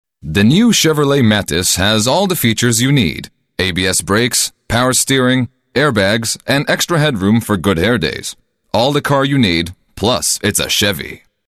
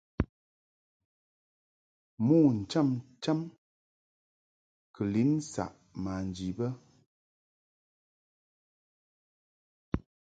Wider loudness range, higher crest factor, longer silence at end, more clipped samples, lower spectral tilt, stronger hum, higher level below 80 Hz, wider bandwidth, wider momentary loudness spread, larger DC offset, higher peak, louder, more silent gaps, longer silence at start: second, 3 LU vs 12 LU; second, 12 dB vs 22 dB; about the same, 0.3 s vs 0.35 s; neither; second, -4 dB/octave vs -7.5 dB/octave; neither; first, -40 dBFS vs -54 dBFS; first, 14.5 kHz vs 9.2 kHz; second, 7 LU vs 14 LU; neither; first, -2 dBFS vs -12 dBFS; first, -13 LUFS vs -31 LUFS; second, none vs 0.29-2.17 s, 3.58-4.94 s, 7.06-9.92 s; about the same, 0.25 s vs 0.2 s